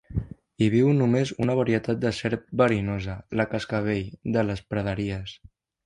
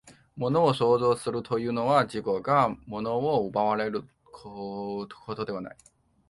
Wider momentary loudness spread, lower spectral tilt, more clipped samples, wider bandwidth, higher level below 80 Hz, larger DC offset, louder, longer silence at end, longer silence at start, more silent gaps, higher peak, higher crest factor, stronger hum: second, 11 LU vs 14 LU; about the same, -7.5 dB/octave vs -6.5 dB/octave; neither; about the same, 11 kHz vs 11.5 kHz; first, -46 dBFS vs -62 dBFS; neither; about the same, -25 LUFS vs -27 LUFS; about the same, 0.5 s vs 0.55 s; about the same, 0.1 s vs 0.05 s; neither; about the same, -6 dBFS vs -8 dBFS; about the same, 18 dB vs 20 dB; neither